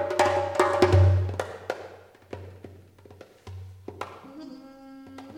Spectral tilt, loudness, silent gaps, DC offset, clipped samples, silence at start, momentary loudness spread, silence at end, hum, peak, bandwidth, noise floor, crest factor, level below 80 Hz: -6.5 dB/octave; -24 LUFS; none; under 0.1%; under 0.1%; 0 s; 25 LU; 0 s; none; -4 dBFS; 12 kHz; -50 dBFS; 22 dB; -50 dBFS